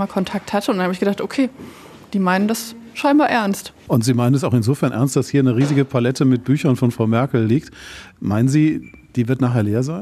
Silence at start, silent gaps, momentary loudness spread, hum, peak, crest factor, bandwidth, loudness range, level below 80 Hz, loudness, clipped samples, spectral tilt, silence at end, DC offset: 0 s; none; 11 LU; none; -2 dBFS; 16 dB; 14 kHz; 2 LU; -54 dBFS; -18 LUFS; under 0.1%; -6.5 dB/octave; 0 s; under 0.1%